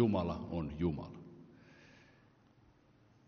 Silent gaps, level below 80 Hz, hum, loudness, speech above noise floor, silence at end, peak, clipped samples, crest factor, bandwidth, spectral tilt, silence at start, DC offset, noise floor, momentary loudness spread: none; -58 dBFS; none; -38 LUFS; 32 dB; 1.4 s; -18 dBFS; under 0.1%; 22 dB; 6.6 kHz; -8 dB/octave; 0 s; under 0.1%; -67 dBFS; 24 LU